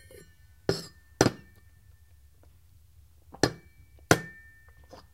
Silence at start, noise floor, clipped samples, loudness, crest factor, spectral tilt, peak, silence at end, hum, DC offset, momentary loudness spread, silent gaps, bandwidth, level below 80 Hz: 0.7 s; -58 dBFS; under 0.1%; -29 LUFS; 32 dB; -4 dB/octave; 0 dBFS; 0.85 s; none; under 0.1%; 26 LU; none; 16 kHz; -54 dBFS